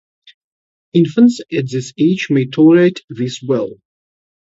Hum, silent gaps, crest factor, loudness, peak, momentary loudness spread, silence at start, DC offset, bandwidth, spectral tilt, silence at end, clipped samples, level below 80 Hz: none; 3.04-3.08 s; 14 dB; -14 LUFS; 0 dBFS; 13 LU; 0.95 s; under 0.1%; 8 kHz; -7 dB/octave; 0.8 s; under 0.1%; -60 dBFS